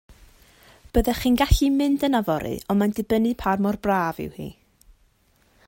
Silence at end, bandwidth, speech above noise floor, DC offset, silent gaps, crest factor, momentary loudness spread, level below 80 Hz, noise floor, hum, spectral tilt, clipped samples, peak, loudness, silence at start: 1.15 s; 16.5 kHz; 40 dB; under 0.1%; none; 18 dB; 9 LU; -34 dBFS; -62 dBFS; none; -6 dB/octave; under 0.1%; -4 dBFS; -23 LUFS; 0.95 s